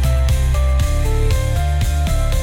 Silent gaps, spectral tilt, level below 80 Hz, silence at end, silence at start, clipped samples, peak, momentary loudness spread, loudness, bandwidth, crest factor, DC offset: none; -5.5 dB/octave; -16 dBFS; 0 s; 0 s; under 0.1%; -6 dBFS; 2 LU; -18 LUFS; 16.5 kHz; 8 dB; under 0.1%